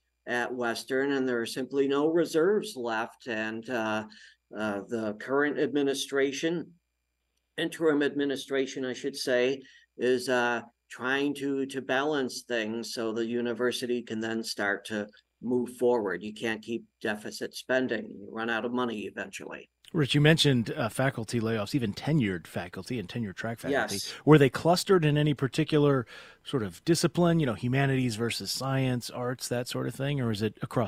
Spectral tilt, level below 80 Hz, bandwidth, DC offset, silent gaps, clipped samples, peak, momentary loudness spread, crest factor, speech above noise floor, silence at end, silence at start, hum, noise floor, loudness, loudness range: -5.5 dB/octave; -62 dBFS; 16 kHz; under 0.1%; none; under 0.1%; -6 dBFS; 11 LU; 22 dB; 51 dB; 0 s; 0.25 s; none; -80 dBFS; -29 LUFS; 6 LU